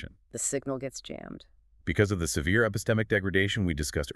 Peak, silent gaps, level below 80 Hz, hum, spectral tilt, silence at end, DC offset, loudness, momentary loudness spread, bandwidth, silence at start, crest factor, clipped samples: -10 dBFS; none; -44 dBFS; none; -4.5 dB/octave; 0.05 s; under 0.1%; -28 LUFS; 15 LU; 13.5 kHz; 0 s; 20 dB; under 0.1%